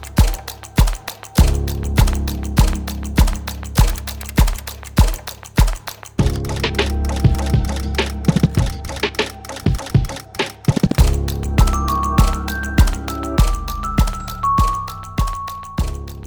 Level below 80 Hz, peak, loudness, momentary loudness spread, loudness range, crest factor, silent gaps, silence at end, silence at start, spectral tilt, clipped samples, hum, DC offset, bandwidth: -20 dBFS; 0 dBFS; -19 LUFS; 8 LU; 2 LU; 16 dB; none; 0 s; 0 s; -5.5 dB/octave; under 0.1%; none; under 0.1%; over 20 kHz